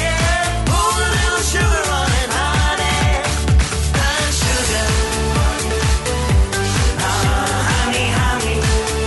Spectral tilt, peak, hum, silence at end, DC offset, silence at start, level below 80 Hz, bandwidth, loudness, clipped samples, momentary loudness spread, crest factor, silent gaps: -3.5 dB/octave; -4 dBFS; none; 0 s; under 0.1%; 0 s; -20 dBFS; 12 kHz; -17 LUFS; under 0.1%; 2 LU; 12 dB; none